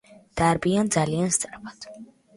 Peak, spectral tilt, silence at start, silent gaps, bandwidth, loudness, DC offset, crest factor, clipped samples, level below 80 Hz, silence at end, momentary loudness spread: -8 dBFS; -4.5 dB/octave; 0.1 s; none; 11.5 kHz; -23 LUFS; under 0.1%; 18 dB; under 0.1%; -52 dBFS; 0.3 s; 18 LU